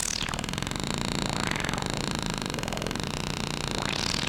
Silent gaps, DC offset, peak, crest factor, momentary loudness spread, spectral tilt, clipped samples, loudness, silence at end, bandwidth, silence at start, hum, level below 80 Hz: none; under 0.1%; -8 dBFS; 22 dB; 3 LU; -3.5 dB/octave; under 0.1%; -30 LUFS; 0 s; 17.5 kHz; 0 s; none; -42 dBFS